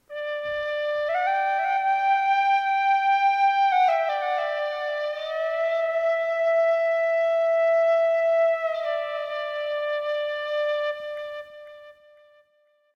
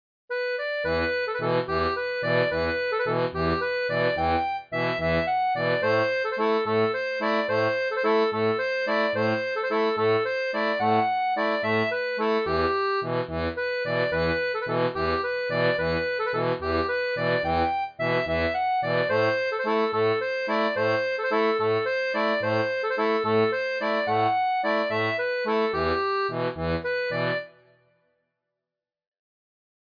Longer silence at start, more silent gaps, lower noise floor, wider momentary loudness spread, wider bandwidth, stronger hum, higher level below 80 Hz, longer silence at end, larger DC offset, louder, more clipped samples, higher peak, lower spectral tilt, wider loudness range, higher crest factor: second, 0.1 s vs 0.3 s; neither; second, -65 dBFS vs -88 dBFS; first, 9 LU vs 4 LU; first, 6.8 kHz vs 5.2 kHz; neither; second, -70 dBFS vs -50 dBFS; second, 1.05 s vs 2.35 s; neither; about the same, -23 LUFS vs -25 LUFS; neither; about the same, -14 dBFS vs -12 dBFS; second, -1 dB/octave vs -7 dB/octave; first, 7 LU vs 2 LU; about the same, 10 dB vs 14 dB